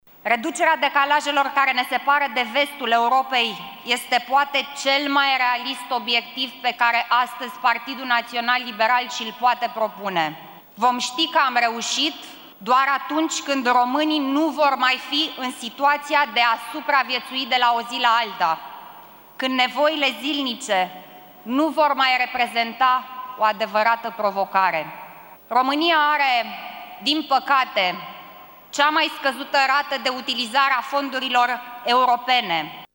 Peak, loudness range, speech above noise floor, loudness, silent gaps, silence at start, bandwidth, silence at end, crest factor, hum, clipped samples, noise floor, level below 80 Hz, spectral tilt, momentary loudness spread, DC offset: -4 dBFS; 2 LU; 23 dB; -20 LUFS; none; 0.25 s; 17 kHz; 0.1 s; 18 dB; none; under 0.1%; -44 dBFS; -70 dBFS; -2 dB/octave; 8 LU; under 0.1%